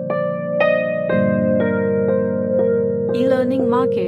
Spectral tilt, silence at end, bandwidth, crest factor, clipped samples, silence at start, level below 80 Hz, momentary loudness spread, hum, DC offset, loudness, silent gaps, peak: -9 dB/octave; 0 s; 5.4 kHz; 14 dB; under 0.1%; 0 s; -62 dBFS; 3 LU; none; under 0.1%; -18 LUFS; none; -4 dBFS